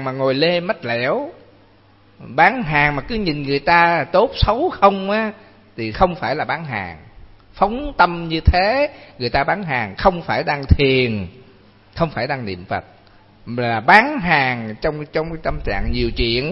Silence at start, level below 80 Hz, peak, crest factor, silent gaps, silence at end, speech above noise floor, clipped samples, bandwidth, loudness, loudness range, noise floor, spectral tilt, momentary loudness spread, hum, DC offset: 0 s; -30 dBFS; 0 dBFS; 18 dB; none; 0 s; 33 dB; under 0.1%; 7.8 kHz; -18 LUFS; 4 LU; -51 dBFS; -7.5 dB/octave; 12 LU; none; under 0.1%